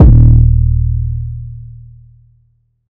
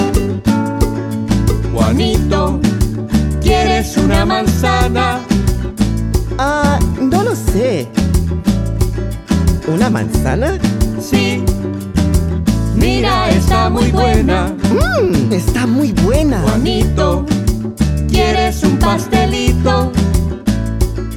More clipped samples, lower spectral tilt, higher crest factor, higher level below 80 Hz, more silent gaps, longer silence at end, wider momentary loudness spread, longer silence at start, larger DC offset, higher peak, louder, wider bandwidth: first, 4% vs under 0.1%; first, -13.5 dB/octave vs -6 dB/octave; about the same, 10 dB vs 12 dB; first, -14 dBFS vs -20 dBFS; neither; first, 1.2 s vs 0 s; first, 24 LU vs 5 LU; about the same, 0 s vs 0 s; neither; about the same, 0 dBFS vs -2 dBFS; first, -11 LUFS vs -14 LUFS; second, 1.4 kHz vs 17 kHz